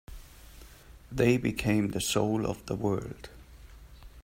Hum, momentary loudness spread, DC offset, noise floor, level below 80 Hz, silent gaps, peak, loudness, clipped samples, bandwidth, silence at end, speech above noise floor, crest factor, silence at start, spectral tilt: none; 22 LU; under 0.1%; -51 dBFS; -50 dBFS; none; -12 dBFS; -29 LUFS; under 0.1%; 16 kHz; 0.05 s; 23 dB; 20 dB; 0.1 s; -5.5 dB/octave